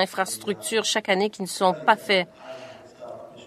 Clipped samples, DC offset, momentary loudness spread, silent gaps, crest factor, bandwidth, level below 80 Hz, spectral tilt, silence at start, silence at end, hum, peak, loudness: under 0.1%; under 0.1%; 20 LU; none; 22 dB; 14 kHz; -72 dBFS; -2.5 dB/octave; 0 s; 0 s; none; -2 dBFS; -23 LUFS